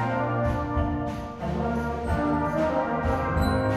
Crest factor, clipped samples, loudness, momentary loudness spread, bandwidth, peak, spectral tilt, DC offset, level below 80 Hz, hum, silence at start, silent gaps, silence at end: 14 dB; under 0.1%; -27 LUFS; 5 LU; 13.5 kHz; -12 dBFS; -8 dB/octave; under 0.1%; -36 dBFS; none; 0 s; none; 0 s